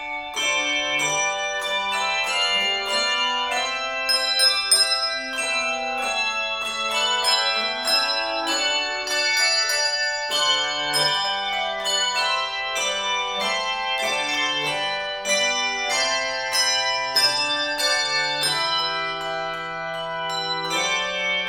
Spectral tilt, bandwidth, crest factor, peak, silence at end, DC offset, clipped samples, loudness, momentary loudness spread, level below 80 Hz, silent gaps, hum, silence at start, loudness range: 0.5 dB/octave; 18 kHz; 18 dB; -4 dBFS; 0 s; under 0.1%; under 0.1%; -21 LUFS; 6 LU; -56 dBFS; none; none; 0 s; 3 LU